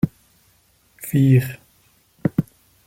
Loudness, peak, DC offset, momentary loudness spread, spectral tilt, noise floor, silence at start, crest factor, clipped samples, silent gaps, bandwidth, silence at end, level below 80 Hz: -20 LUFS; -4 dBFS; under 0.1%; 21 LU; -8 dB/octave; -59 dBFS; 0.05 s; 18 dB; under 0.1%; none; 16.5 kHz; 0.45 s; -52 dBFS